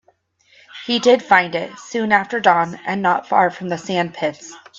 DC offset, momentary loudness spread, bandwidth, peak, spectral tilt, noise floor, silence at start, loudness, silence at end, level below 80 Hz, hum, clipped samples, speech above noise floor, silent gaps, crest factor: under 0.1%; 11 LU; 7.8 kHz; 0 dBFS; -4.5 dB/octave; -59 dBFS; 0.75 s; -18 LUFS; 0.2 s; -66 dBFS; none; under 0.1%; 41 dB; none; 18 dB